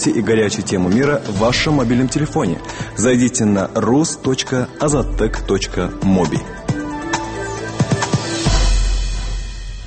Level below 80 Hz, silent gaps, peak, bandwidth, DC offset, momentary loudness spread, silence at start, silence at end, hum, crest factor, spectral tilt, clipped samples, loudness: -26 dBFS; none; -4 dBFS; 8.8 kHz; under 0.1%; 9 LU; 0 s; 0 s; none; 14 dB; -5 dB/octave; under 0.1%; -18 LUFS